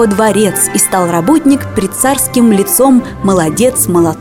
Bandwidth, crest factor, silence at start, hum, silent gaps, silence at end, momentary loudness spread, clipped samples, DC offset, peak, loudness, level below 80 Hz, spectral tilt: 18 kHz; 10 dB; 0 s; none; none; 0 s; 4 LU; under 0.1%; under 0.1%; 0 dBFS; -10 LUFS; -38 dBFS; -4.5 dB/octave